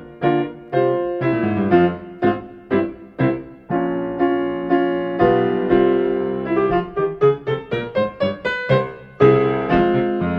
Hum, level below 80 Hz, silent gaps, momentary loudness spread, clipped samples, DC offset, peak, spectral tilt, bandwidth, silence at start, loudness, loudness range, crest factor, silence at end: none; -46 dBFS; none; 7 LU; under 0.1%; under 0.1%; -2 dBFS; -9.5 dB/octave; 5.6 kHz; 0 s; -19 LUFS; 2 LU; 18 dB; 0 s